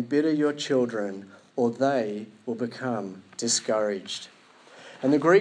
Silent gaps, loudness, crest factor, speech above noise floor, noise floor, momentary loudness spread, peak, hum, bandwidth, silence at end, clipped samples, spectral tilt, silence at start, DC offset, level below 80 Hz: none; -27 LUFS; 18 dB; 26 dB; -51 dBFS; 13 LU; -8 dBFS; none; 10.5 kHz; 0 s; under 0.1%; -4 dB/octave; 0 s; under 0.1%; -84 dBFS